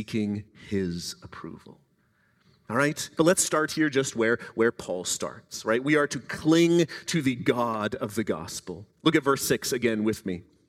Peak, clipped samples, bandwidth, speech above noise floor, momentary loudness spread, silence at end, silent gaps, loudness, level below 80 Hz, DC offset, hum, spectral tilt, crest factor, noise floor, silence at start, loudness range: -8 dBFS; under 0.1%; 16 kHz; 41 dB; 13 LU; 0.25 s; none; -26 LUFS; -62 dBFS; under 0.1%; none; -4.5 dB/octave; 20 dB; -67 dBFS; 0 s; 3 LU